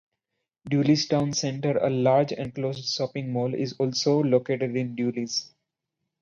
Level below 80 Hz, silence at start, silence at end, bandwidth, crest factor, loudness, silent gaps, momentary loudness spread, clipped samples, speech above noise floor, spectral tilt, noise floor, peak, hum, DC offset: -66 dBFS; 0.65 s; 0.75 s; 7.6 kHz; 18 dB; -25 LUFS; none; 7 LU; under 0.1%; 58 dB; -5.5 dB/octave; -83 dBFS; -8 dBFS; none; under 0.1%